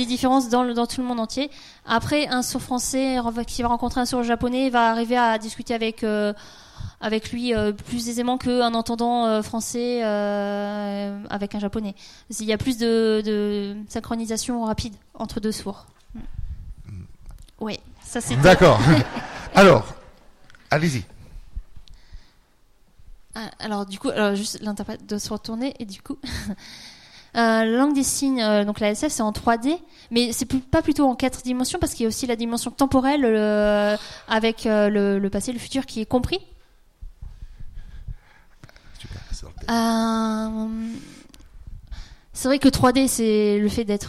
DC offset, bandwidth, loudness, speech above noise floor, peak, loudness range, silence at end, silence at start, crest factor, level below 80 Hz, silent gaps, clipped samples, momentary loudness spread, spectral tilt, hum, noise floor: under 0.1%; 15.5 kHz; -22 LUFS; 34 dB; -4 dBFS; 11 LU; 0 s; 0 s; 18 dB; -42 dBFS; none; under 0.1%; 19 LU; -5 dB/octave; none; -56 dBFS